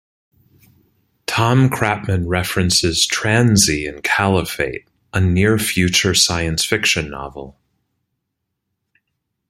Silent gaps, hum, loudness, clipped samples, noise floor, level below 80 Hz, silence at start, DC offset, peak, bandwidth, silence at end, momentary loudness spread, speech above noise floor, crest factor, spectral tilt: none; none; -16 LUFS; under 0.1%; -76 dBFS; -42 dBFS; 1.3 s; under 0.1%; 0 dBFS; 16.5 kHz; 2 s; 11 LU; 60 dB; 18 dB; -3.5 dB/octave